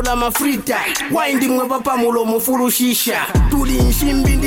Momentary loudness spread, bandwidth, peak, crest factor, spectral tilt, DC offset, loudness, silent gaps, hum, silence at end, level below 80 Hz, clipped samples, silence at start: 3 LU; 17 kHz; -6 dBFS; 10 dB; -4.5 dB/octave; under 0.1%; -16 LUFS; none; none; 0 s; -22 dBFS; under 0.1%; 0 s